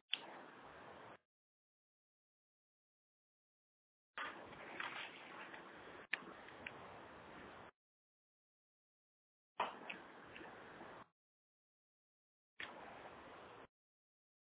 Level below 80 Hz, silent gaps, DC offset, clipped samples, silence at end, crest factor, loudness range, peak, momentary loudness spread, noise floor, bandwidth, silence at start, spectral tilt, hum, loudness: -84 dBFS; 1.25-4.14 s, 7.76-9.55 s, 11.12-12.56 s; under 0.1%; under 0.1%; 0.85 s; 34 dB; 8 LU; -22 dBFS; 14 LU; under -90 dBFS; 4 kHz; 0.1 s; 0 dB/octave; none; -52 LUFS